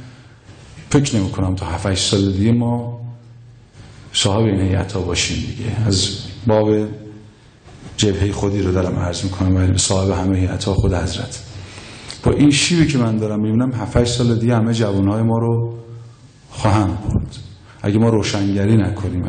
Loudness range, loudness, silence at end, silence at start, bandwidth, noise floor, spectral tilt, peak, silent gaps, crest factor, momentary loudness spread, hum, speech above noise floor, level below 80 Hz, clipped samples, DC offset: 3 LU; -18 LUFS; 0 s; 0 s; 9.6 kHz; -43 dBFS; -5.5 dB/octave; -4 dBFS; none; 14 dB; 14 LU; none; 27 dB; -38 dBFS; under 0.1%; under 0.1%